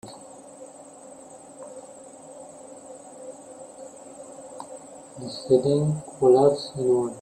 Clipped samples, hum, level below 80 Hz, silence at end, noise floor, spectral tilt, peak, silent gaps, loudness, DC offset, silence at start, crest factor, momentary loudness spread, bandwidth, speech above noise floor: under 0.1%; none; -66 dBFS; 0 s; -45 dBFS; -7 dB/octave; -6 dBFS; none; -22 LUFS; under 0.1%; 0.05 s; 20 dB; 24 LU; 9 kHz; 24 dB